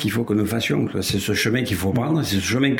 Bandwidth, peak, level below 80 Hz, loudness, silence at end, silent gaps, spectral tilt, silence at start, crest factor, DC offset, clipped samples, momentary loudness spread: 17 kHz; -6 dBFS; -48 dBFS; -21 LUFS; 0 s; none; -5 dB/octave; 0 s; 16 dB; under 0.1%; under 0.1%; 2 LU